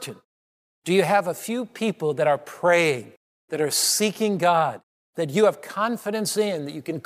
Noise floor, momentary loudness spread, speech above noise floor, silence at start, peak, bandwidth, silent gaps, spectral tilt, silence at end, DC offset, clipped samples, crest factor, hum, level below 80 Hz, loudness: under -90 dBFS; 12 LU; over 67 dB; 0 s; -6 dBFS; 15.5 kHz; 0.25-0.82 s, 3.17-3.48 s, 4.83-5.13 s; -3.5 dB/octave; 0.05 s; under 0.1%; under 0.1%; 18 dB; none; -78 dBFS; -23 LUFS